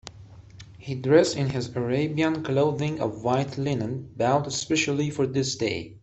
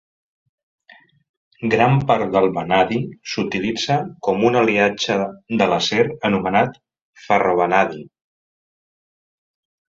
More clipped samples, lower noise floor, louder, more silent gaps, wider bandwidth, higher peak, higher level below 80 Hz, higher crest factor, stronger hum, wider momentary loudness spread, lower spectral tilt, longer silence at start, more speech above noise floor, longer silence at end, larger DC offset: neither; second, -46 dBFS vs -51 dBFS; second, -25 LUFS vs -19 LUFS; second, none vs 7.02-7.13 s; about the same, 8.4 kHz vs 7.8 kHz; second, -6 dBFS vs -2 dBFS; about the same, -56 dBFS vs -54 dBFS; about the same, 18 dB vs 18 dB; neither; about the same, 9 LU vs 8 LU; about the same, -5.5 dB/octave vs -5.5 dB/octave; second, 0.05 s vs 1.6 s; second, 22 dB vs 33 dB; second, 0.05 s vs 1.85 s; neither